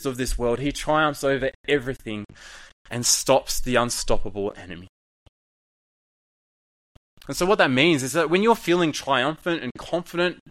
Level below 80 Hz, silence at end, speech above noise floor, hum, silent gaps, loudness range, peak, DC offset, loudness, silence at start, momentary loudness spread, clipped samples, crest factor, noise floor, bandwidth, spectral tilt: -38 dBFS; 0.15 s; over 67 dB; none; 1.55-1.64 s, 2.73-2.85 s, 4.89-7.17 s, 9.71-9.75 s; 10 LU; -2 dBFS; under 0.1%; -23 LUFS; 0 s; 15 LU; under 0.1%; 22 dB; under -90 dBFS; 16 kHz; -3.5 dB/octave